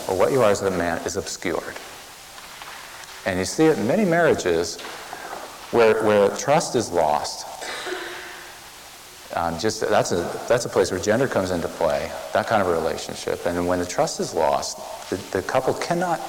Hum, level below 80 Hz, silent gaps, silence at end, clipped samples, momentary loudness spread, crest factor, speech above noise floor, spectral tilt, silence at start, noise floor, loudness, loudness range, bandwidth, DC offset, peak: none; -52 dBFS; none; 0 s; under 0.1%; 18 LU; 16 dB; 21 dB; -4 dB/octave; 0 s; -42 dBFS; -22 LUFS; 5 LU; 18 kHz; under 0.1%; -8 dBFS